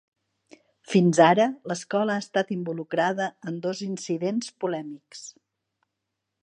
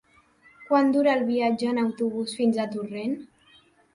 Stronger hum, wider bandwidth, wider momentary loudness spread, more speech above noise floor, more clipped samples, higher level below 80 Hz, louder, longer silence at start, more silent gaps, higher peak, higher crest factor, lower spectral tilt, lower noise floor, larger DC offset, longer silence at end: neither; about the same, 10 kHz vs 11 kHz; first, 18 LU vs 10 LU; first, 58 dB vs 34 dB; neither; second, -76 dBFS vs -70 dBFS; about the same, -25 LUFS vs -25 LUFS; first, 0.9 s vs 0.6 s; neither; first, -4 dBFS vs -10 dBFS; first, 22 dB vs 16 dB; about the same, -5.5 dB/octave vs -5.5 dB/octave; first, -82 dBFS vs -58 dBFS; neither; first, 1.15 s vs 0.7 s